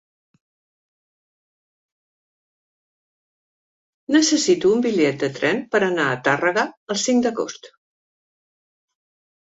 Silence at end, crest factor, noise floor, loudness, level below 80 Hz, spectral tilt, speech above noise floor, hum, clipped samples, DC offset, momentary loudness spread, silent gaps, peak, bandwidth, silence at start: 1.85 s; 20 dB; under -90 dBFS; -20 LUFS; -66 dBFS; -3.5 dB/octave; over 71 dB; none; under 0.1%; under 0.1%; 8 LU; 6.77-6.87 s; -4 dBFS; 8.2 kHz; 4.1 s